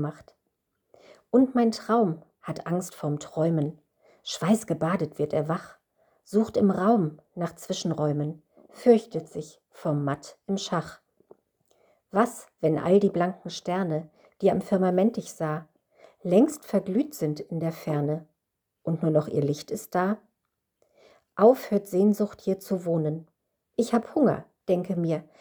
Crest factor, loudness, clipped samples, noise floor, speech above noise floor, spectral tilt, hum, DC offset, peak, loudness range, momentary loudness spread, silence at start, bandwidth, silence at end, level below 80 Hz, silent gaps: 20 dB; -26 LUFS; under 0.1%; -82 dBFS; 57 dB; -7 dB/octave; none; under 0.1%; -6 dBFS; 3 LU; 13 LU; 0 s; over 20 kHz; 0.2 s; -68 dBFS; none